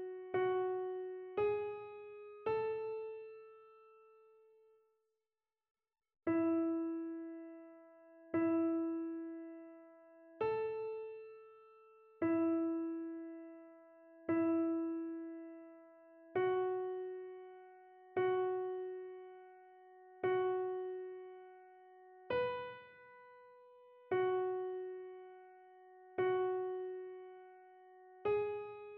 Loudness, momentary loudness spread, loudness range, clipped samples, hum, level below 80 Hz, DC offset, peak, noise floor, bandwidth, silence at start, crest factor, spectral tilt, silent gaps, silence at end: -39 LUFS; 24 LU; 6 LU; under 0.1%; none; -82 dBFS; under 0.1%; -24 dBFS; under -90 dBFS; 4.3 kHz; 0 s; 16 dB; -5 dB/octave; 5.71-5.75 s; 0 s